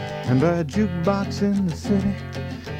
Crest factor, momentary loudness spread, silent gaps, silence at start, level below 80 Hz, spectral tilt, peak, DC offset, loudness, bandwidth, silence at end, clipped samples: 14 dB; 9 LU; none; 0 s; -44 dBFS; -7.5 dB/octave; -8 dBFS; under 0.1%; -23 LUFS; 11.5 kHz; 0 s; under 0.1%